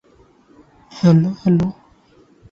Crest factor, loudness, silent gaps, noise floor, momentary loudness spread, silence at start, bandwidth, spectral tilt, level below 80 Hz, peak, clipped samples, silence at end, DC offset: 18 dB; -17 LUFS; none; -52 dBFS; 5 LU; 0.95 s; 7 kHz; -9 dB/octave; -50 dBFS; -2 dBFS; under 0.1%; 0.8 s; under 0.1%